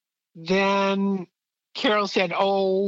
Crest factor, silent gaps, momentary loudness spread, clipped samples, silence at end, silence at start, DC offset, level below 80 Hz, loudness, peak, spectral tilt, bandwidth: 16 dB; none; 15 LU; under 0.1%; 0 s; 0.35 s; under 0.1%; -70 dBFS; -23 LUFS; -6 dBFS; -5.5 dB/octave; 7.8 kHz